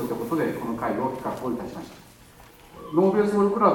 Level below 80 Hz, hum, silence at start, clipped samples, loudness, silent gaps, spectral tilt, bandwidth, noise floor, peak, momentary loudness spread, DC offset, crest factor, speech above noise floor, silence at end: -56 dBFS; none; 0 s; under 0.1%; -25 LUFS; none; -7.5 dB/octave; 18.5 kHz; -50 dBFS; -6 dBFS; 17 LU; under 0.1%; 18 dB; 26 dB; 0 s